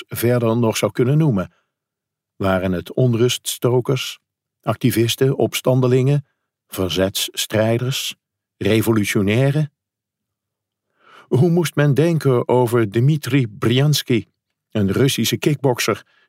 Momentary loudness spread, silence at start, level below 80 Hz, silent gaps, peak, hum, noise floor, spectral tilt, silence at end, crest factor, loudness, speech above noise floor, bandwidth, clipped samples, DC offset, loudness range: 7 LU; 0 s; -58 dBFS; none; -4 dBFS; none; -83 dBFS; -5.5 dB/octave; 0.3 s; 16 dB; -18 LUFS; 66 dB; 16 kHz; under 0.1%; under 0.1%; 3 LU